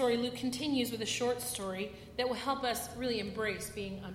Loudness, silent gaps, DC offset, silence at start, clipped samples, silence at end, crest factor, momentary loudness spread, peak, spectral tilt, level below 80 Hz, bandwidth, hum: -35 LUFS; none; under 0.1%; 0 s; under 0.1%; 0 s; 16 dB; 7 LU; -18 dBFS; -3.5 dB/octave; -60 dBFS; 16.5 kHz; none